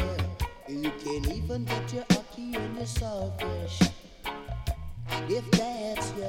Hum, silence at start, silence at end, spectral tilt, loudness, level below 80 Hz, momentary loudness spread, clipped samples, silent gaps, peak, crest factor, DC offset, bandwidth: none; 0 s; 0 s; -5.5 dB/octave; -31 LUFS; -40 dBFS; 10 LU; under 0.1%; none; -8 dBFS; 22 dB; under 0.1%; 17.5 kHz